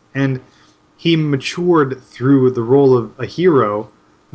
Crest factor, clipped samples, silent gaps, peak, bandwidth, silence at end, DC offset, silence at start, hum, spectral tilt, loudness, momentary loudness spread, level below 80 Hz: 12 dB; under 0.1%; none; -2 dBFS; 8 kHz; 0.5 s; under 0.1%; 0.15 s; none; -7.5 dB/octave; -15 LUFS; 9 LU; -56 dBFS